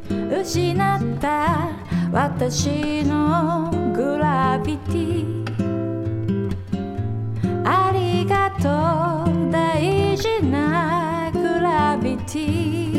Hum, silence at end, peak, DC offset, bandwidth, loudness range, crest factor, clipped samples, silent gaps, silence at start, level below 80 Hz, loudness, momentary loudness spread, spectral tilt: none; 0 s; -6 dBFS; under 0.1%; 15.5 kHz; 3 LU; 16 dB; under 0.1%; none; 0 s; -44 dBFS; -21 LUFS; 6 LU; -6.5 dB/octave